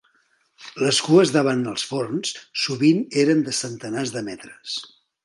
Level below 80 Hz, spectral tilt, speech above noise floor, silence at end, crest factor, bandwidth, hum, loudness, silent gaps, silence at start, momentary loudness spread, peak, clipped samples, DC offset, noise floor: -68 dBFS; -4.5 dB/octave; 43 dB; 0.4 s; 20 dB; 11.5 kHz; none; -21 LUFS; none; 0.6 s; 14 LU; -2 dBFS; under 0.1%; under 0.1%; -64 dBFS